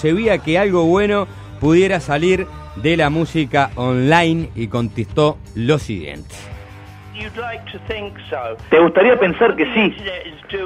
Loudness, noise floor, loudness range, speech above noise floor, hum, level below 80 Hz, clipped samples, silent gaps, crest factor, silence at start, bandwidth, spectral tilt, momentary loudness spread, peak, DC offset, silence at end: -17 LUFS; -37 dBFS; 7 LU; 20 dB; none; -40 dBFS; under 0.1%; none; 16 dB; 0 s; 11.5 kHz; -6.5 dB/octave; 16 LU; 0 dBFS; under 0.1%; 0 s